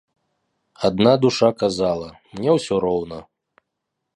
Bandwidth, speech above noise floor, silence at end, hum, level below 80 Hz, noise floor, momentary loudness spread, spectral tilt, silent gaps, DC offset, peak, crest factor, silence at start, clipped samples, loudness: 11.5 kHz; 60 dB; 0.95 s; none; -52 dBFS; -79 dBFS; 15 LU; -6 dB/octave; none; under 0.1%; -2 dBFS; 18 dB; 0.8 s; under 0.1%; -19 LUFS